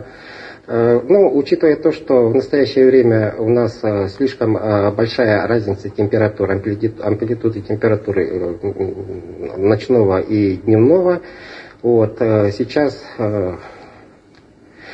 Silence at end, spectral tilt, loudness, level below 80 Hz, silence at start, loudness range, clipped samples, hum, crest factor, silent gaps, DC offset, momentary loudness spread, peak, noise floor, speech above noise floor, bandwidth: 0 s; -8.5 dB/octave; -16 LUFS; -50 dBFS; 0 s; 5 LU; under 0.1%; none; 16 dB; none; under 0.1%; 11 LU; 0 dBFS; -47 dBFS; 32 dB; 8 kHz